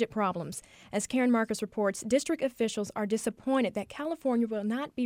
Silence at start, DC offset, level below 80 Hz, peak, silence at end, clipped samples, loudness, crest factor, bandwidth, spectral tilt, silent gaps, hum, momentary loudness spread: 0 s; under 0.1%; -66 dBFS; -14 dBFS; 0 s; under 0.1%; -31 LUFS; 16 dB; 16 kHz; -4.5 dB/octave; none; none; 8 LU